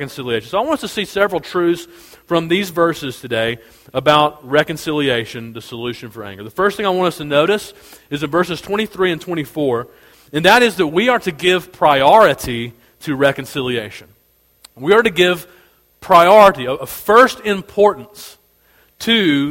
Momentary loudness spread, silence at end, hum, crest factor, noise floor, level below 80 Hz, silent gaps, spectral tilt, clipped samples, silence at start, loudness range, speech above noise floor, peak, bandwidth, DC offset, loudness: 16 LU; 0 s; none; 16 dB; -54 dBFS; -50 dBFS; none; -4.5 dB/octave; under 0.1%; 0 s; 6 LU; 38 dB; 0 dBFS; 17 kHz; under 0.1%; -15 LUFS